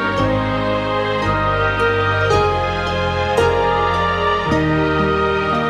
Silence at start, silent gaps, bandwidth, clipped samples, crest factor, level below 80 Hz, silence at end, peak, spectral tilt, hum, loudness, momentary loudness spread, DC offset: 0 s; none; 12 kHz; under 0.1%; 16 dB; -32 dBFS; 0 s; -2 dBFS; -6 dB/octave; none; -17 LUFS; 3 LU; under 0.1%